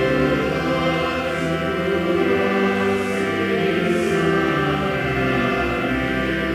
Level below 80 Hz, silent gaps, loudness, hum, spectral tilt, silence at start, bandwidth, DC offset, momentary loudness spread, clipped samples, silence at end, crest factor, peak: -40 dBFS; none; -20 LUFS; none; -6 dB/octave; 0 s; 16 kHz; under 0.1%; 3 LU; under 0.1%; 0 s; 14 dB; -6 dBFS